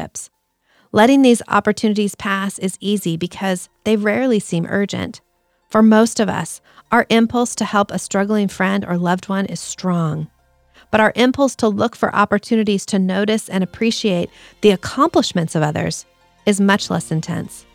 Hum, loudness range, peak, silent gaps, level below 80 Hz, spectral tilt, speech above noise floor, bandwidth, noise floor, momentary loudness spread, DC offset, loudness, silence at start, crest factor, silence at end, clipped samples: none; 3 LU; -2 dBFS; none; -54 dBFS; -5 dB/octave; 43 dB; 15 kHz; -60 dBFS; 10 LU; under 0.1%; -17 LUFS; 0 s; 16 dB; 0.15 s; under 0.1%